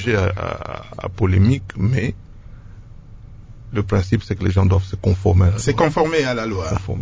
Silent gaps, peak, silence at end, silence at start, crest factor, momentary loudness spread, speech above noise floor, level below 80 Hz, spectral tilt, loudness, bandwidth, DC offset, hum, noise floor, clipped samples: none; -2 dBFS; 0 s; 0 s; 18 dB; 11 LU; 21 dB; -30 dBFS; -7 dB/octave; -19 LUFS; 8 kHz; under 0.1%; none; -38 dBFS; under 0.1%